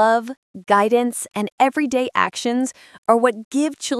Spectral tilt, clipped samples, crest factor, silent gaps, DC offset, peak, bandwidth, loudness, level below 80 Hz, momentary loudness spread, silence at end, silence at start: -3.5 dB/octave; under 0.1%; 18 dB; 0.37-0.54 s, 1.52-1.58 s, 2.98-3.03 s, 3.45-3.51 s; under 0.1%; -2 dBFS; 12 kHz; -20 LUFS; -68 dBFS; 10 LU; 0 s; 0 s